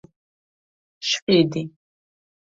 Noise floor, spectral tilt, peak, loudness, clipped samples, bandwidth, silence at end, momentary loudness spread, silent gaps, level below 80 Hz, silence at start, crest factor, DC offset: under -90 dBFS; -4.5 dB/octave; -6 dBFS; -21 LUFS; under 0.1%; 7.8 kHz; 0.85 s; 13 LU; 1.22-1.27 s; -64 dBFS; 1 s; 20 dB; under 0.1%